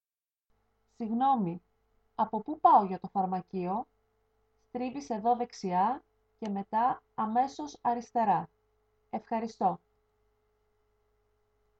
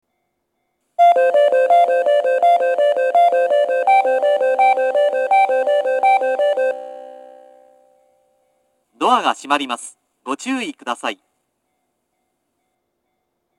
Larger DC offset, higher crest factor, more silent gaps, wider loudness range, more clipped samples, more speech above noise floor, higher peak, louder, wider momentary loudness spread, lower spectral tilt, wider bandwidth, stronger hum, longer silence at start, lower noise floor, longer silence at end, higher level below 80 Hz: neither; about the same, 22 dB vs 18 dB; neither; second, 5 LU vs 11 LU; neither; first, over 60 dB vs 49 dB; second, -10 dBFS vs 0 dBFS; second, -31 LUFS vs -16 LUFS; about the same, 14 LU vs 13 LU; first, -7 dB/octave vs -2 dB/octave; second, 7.8 kHz vs 12 kHz; first, 50 Hz at -60 dBFS vs none; about the same, 1 s vs 1 s; first, under -90 dBFS vs -72 dBFS; second, 2.05 s vs 2.45 s; first, -72 dBFS vs -82 dBFS